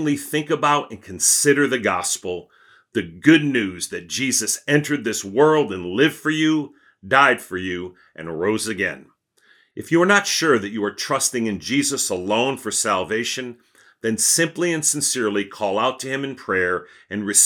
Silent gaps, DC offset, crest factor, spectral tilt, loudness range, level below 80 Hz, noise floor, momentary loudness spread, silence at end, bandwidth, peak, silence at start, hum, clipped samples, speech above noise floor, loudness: none; under 0.1%; 20 dB; -3 dB/octave; 3 LU; -68 dBFS; -58 dBFS; 13 LU; 0 s; 19 kHz; 0 dBFS; 0 s; none; under 0.1%; 38 dB; -20 LUFS